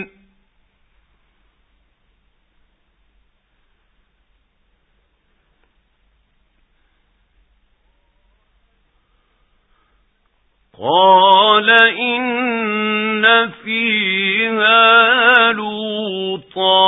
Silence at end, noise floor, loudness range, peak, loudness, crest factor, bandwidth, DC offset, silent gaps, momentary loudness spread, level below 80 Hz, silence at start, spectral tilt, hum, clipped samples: 0 s; -62 dBFS; 4 LU; 0 dBFS; -13 LUFS; 18 dB; 4 kHz; under 0.1%; none; 13 LU; -62 dBFS; 0 s; -6 dB/octave; none; under 0.1%